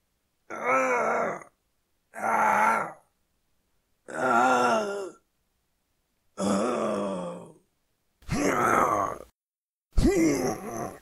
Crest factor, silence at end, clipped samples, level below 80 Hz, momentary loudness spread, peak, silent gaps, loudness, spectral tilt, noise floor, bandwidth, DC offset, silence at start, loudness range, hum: 20 dB; 0.05 s; under 0.1%; -42 dBFS; 17 LU; -8 dBFS; 9.34-9.51 s, 9.58-9.73 s, 9.85-9.89 s; -26 LUFS; -5 dB/octave; under -90 dBFS; 16 kHz; under 0.1%; 0.5 s; 5 LU; none